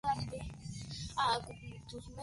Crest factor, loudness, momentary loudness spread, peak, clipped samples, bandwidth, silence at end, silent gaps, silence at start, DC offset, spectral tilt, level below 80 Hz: 20 dB; -39 LUFS; 15 LU; -18 dBFS; under 0.1%; 11.5 kHz; 0 s; none; 0.05 s; under 0.1%; -4 dB/octave; -54 dBFS